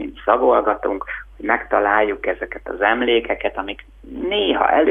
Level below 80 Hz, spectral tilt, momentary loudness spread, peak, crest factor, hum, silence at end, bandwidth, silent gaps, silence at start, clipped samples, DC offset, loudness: -44 dBFS; -6.5 dB/octave; 13 LU; 0 dBFS; 18 dB; none; 0 s; 3.8 kHz; none; 0 s; under 0.1%; under 0.1%; -19 LUFS